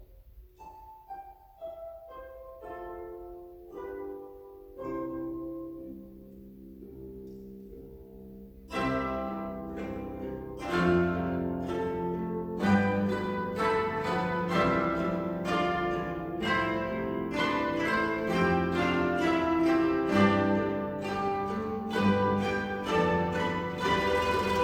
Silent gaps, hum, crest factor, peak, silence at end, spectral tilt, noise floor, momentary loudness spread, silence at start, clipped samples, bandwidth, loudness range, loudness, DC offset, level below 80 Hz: none; none; 18 dB; -12 dBFS; 0 s; -6.5 dB/octave; -53 dBFS; 21 LU; 0 s; under 0.1%; 19 kHz; 16 LU; -29 LUFS; under 0.1%; -52 dBFS